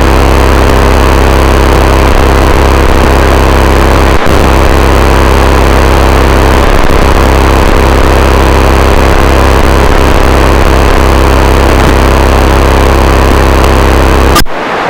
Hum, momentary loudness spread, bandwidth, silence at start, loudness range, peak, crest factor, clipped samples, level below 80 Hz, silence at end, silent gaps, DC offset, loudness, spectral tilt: none; 1 LU; 17 kHz; 0 s; 0 LU; 0 dBFS; 4 dB; under 0.1%; -8 dBFS; 0 s; none; 7%; -6 LUFS; -5.5 dB/octave